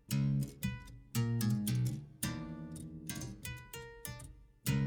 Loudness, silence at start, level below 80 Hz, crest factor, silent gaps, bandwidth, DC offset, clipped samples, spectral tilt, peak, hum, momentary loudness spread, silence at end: -39 LUFS; 0.1 s; -56 dBFS; 18 dB; none; over 20 kHz; under 0.1%; under 0.1%; -5.5 dB/octave; -20 dBFS; none; 13 LU; 0 s